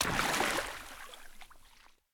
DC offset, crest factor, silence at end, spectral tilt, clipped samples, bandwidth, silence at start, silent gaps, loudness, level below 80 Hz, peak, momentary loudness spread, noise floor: under 0.1%; 22 dB; 0.25 s; -2 dB/octave; under 0.1%; over 20 kHz; 0 s; none; -32 LUFS; -52 dBFS; -14 dBFS; 23 LU; -61 dBFS